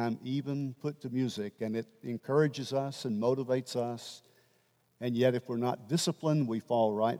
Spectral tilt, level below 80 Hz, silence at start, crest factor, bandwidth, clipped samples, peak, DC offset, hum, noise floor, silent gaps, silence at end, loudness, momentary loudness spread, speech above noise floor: -6 dB/octave; -84 dBFS; 0 s; 18 dB; 16 kHz; under 0.1%; -14 dBFS; under 0.1%; none; -71 dBFS; none; 0 s; -32 LUFS; 10 LU; 39 dB